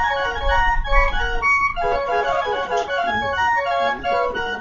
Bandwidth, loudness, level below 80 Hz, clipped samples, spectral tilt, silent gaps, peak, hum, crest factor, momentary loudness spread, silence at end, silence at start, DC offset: 7.4 kHz; -20 LUFS; -28 dBFS; under 0.1%; -4 dB/octave; none; -2 dBFS; none; 18 dB; 4 LU; 0 s; 0 s; under 0.1%